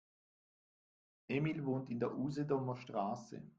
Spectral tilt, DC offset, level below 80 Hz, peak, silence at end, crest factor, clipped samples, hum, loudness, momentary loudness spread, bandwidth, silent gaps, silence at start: -8 dB/octave; under 0.1%; -76 dBFS; -22 dBFS; 0.1 s; 18 dB; under 0.1%; none; -40 LUFS; 4 LU; 7.8 kHz; none; 1.3 s